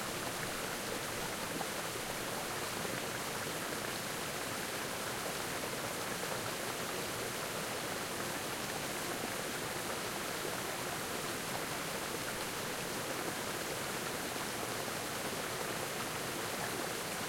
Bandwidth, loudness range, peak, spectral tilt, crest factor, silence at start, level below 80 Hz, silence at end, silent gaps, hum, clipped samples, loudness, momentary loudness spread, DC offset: 16.5 kHz; 0 LU; -22 dBFS; -2.5 dB/octave; 16 dB; 0 s; -64 dBFS; 0 s; none; none; under 0.1%; -38 LUFS; 1 LU; under 0.1%